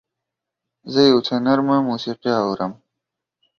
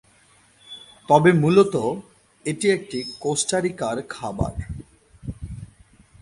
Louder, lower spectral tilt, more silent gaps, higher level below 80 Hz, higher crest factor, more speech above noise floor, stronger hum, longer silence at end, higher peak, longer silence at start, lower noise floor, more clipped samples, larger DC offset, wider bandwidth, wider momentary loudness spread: about the same, -19 LUFS vs -21 LUFS; about the same, -6 dB/octave vs -5 dB/octave; neither; second, -62 dBFS vs -44 dBFS; about the same, 18 dB vs 20 dB; first, 65 dB vs 36 dB; neither; first, 0.85 s vs 0.55 s; about the same, -2 dBFS vs -2 dBFS; first, 0.85 s vs 0.7 s; first, -83 dBFS vs -56 dBFS; neither; neither; second, 6.8 kHz vs 11.5 kHz; second, 9 LU vs 23 LU